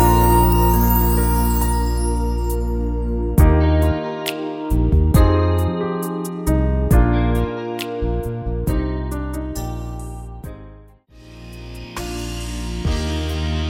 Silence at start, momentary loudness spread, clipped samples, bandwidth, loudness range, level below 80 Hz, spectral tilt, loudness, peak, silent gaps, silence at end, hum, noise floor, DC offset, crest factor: 0 s; 16 LU; under 0.1%; over 20 kHz; 12 LU; -22 dBFS; -6.5 dB/octave; -19 LUFS; -2 dBFS; none; 0 s; none; -45 dBFS; under 0.1%; 16 dB